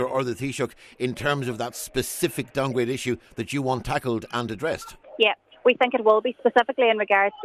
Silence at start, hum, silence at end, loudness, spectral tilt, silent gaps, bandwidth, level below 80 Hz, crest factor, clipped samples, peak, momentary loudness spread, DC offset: 0 s; none; 0 s; -24 LUFS; -4.5 dB/octave; none; 14 kHz; -52 dBFS; 18 dB; under 0.1%; -6 dBFS; 10 LU; under 0.1%